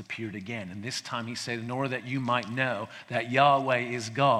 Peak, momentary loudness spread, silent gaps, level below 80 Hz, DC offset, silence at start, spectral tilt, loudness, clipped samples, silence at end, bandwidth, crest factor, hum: -8 dBFS; 13 LU; none; -72 dBFS; under 0.1%; 0 s; -5 dB/octave; -29 LUFS; under 0.1%; 0 s; 13.5 kHz; 20 dB; none